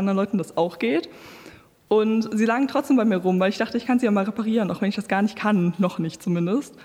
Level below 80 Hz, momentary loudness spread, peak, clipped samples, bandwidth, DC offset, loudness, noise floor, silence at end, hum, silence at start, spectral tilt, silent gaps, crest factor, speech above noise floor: -64 dBFS; 6 LU; -8 dBFS; under 0.1%; 14 kHz; under 0.1%; -23 LUFS; -48 dBFS; 0 s; none; 0 s; -7 dB/octave; none; 14 dB; 26 dB